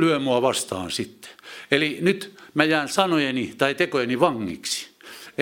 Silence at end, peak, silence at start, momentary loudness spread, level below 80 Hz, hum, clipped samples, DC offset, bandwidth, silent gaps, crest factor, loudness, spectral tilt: 0 s; 0 dBFS; 0 s; 15 LU; -66 dBFS; none; under 0.1%; under 0.1%; 17 kHz; none; 24 dB; -23 LUFS; -4 dB/octave